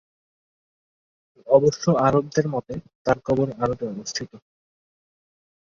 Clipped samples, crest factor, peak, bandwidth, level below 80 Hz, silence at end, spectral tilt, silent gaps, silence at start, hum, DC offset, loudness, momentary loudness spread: under 0.1%; 22 dB; -2 dBFS; 7.4 kHz; -54 dBFS; 1.25 s; -6 dB/octave; 2.95-3.05 s; 1.45 s; none; under 0.1%; -22 LUFS; 12 LU